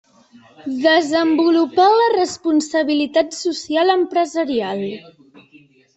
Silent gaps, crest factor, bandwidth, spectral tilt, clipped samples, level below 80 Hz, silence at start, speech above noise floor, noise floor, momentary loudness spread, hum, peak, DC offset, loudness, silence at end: none; 16 dB; 8.2 kHz; -3.5 dB/octave; under 0.1%; -64 dBFS; 0.65 s; 34 dB; -50 dBFS; 11 LU; none; -2 dBFS; under 0.1%; -17 LUFS; 0.95 s